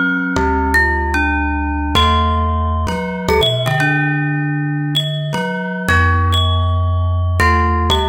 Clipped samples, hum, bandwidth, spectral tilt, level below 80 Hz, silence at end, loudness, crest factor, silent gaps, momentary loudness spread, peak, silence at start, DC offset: under 0.1%; none; 16.5 kHz; -5.5 dB/octave; -24 dBFS; 0 s; -16 LUFS; 16 dB; none; 6 LU; 0 dBFS; 0 s; under 0.1%